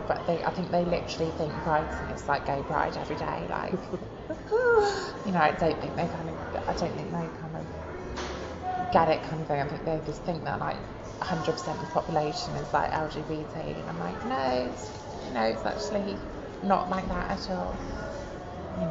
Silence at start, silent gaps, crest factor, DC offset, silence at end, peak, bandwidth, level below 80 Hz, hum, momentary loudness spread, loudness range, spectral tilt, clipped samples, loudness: 0 s; none; 22 dB; under 0.1%; 0 s; -8 dBFS; 8 kHz; -46 dBFS; none; 12 LU; 4 LU; -6 dB/octave; under 0.1%; -30 LUFS